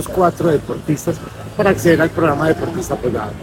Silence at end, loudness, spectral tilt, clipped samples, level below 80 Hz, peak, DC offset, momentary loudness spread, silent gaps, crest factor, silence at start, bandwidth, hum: 0 s; -17 LUFS; -6 dB/octave; under 0.1%; -38 dBFS; 0 dBFS; under 0.1%; 8 LU; none; 16 dB; 0 s; 17 kHz; none